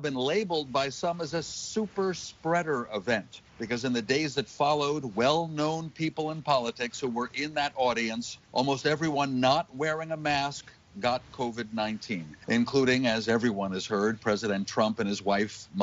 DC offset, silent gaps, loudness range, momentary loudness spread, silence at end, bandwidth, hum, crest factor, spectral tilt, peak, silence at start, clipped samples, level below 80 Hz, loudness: under 0.1%; none; 3 LU; 7 LU; 0 s; 8 kHz; none; 20 dB; -3.5 dB/octave; -10 dBFS; 0 s; under 0.1%; -62 dBFS; -29 LUFS